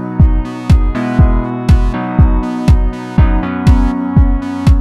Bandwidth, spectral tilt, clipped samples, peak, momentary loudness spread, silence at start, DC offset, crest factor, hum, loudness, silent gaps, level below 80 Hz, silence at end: 9.6 kHz; -8.5 dB/octave; under 0.1%; 0 dBFS; 3 LU; 0 s; under 0.1%; 10 dB; none; -13 LUFS; none; -14 dBFS; 0 s